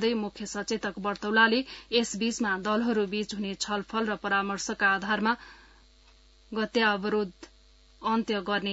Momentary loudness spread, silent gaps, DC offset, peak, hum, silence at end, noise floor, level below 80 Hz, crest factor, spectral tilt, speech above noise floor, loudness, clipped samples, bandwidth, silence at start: 9 LU; none; under 0.1%; -8 dBFS; none; 0 s; -58 dBFS; -60 dBFS; 20 dB; -3.5 dB/octave; 30 dB; -28 LUFS; under 0.1%; 8 kHz; 0 s